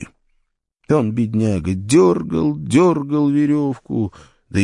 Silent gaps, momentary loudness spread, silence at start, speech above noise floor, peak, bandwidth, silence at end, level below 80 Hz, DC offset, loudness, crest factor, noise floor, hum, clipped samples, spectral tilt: none; 10 LU; 0 s; 50 dB; -2 dBFS; 11.5 kHz; 0 s; -50 dBFS; under 0.1%; -18 LUFS; 16 dB; -67 dBFS; none; under 0.1%; -7 dB/octave